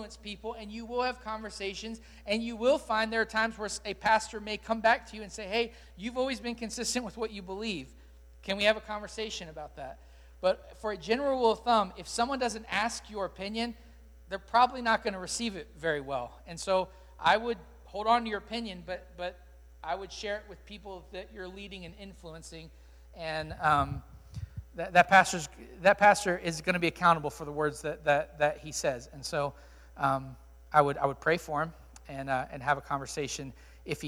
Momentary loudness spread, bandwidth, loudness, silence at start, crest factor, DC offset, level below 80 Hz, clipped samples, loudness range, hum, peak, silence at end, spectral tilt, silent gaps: 18 LU; 17.5 kHz; -30 LUFS; 0 s; 26 dB; under 0.1%; -54 dBFS; under 0.1%; 9 LU; none; -6 dBFS; 0 s; -3.5 dB/octave; none